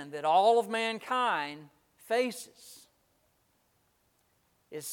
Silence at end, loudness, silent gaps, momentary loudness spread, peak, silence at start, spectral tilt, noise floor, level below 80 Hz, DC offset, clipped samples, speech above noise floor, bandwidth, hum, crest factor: 0 s; -29 LUFS; none; 21 LU; -14 dBFS; 0 s; -3 dB/octave; -72 dBFS; -84 dBFS; under 0.1%; under 0.1%; 43 dB; 18 kHz; none; 20 dB